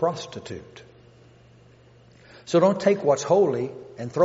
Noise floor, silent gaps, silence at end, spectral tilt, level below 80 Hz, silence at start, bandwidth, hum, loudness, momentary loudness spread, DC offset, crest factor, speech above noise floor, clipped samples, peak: -53 dBFS; none; 0 s; -6 dB/octave; -66 dBFS; 0 s; 8 kHz; none; -22 LUFS; 18 LU; under 0.1%; 18 dB; 30 dB; under 0.1%; -6 dBFS